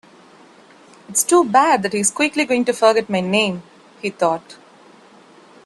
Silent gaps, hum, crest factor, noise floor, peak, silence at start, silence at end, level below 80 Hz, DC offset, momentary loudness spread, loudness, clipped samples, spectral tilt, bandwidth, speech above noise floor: none; none; 20 dB; -47 dBFS; 0 dBFS; 1.1 s; 1.15 s; -66 dBFS; under 0.1%; 11 LU; -17 LUFS; under 0.1%; -3 dB/octave; 12.5 kHz; 30 dB